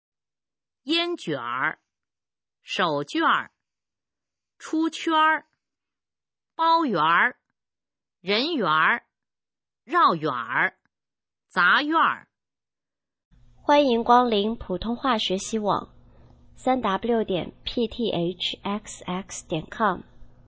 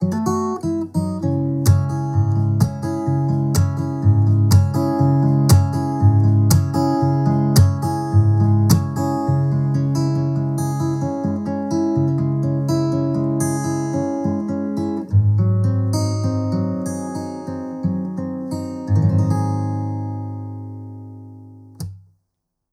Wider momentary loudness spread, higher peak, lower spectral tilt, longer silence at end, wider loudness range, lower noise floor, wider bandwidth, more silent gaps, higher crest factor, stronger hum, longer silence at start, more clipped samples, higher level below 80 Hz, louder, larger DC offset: about the same, 12 LU vs 12 LU; about the same, -4 dBFS vs -2 dBFS; second, -4 dB/octave vs -7.5 dB/octave; second, 0.2 s vs 0.75 s; second, 4 LU vs 7 LU; first, under -90 dBFS vs -76 dBFS; second, 8 kHz vs 15 kHz; first, 13.25-13.31 s vs none; first, 22 dB vs 16 dB; neither; first, 0.85 s vs 0 s; neither; second, -54 dBFS vs -44 dBFS; second, -24 LUFS vs -19 LUFS; neither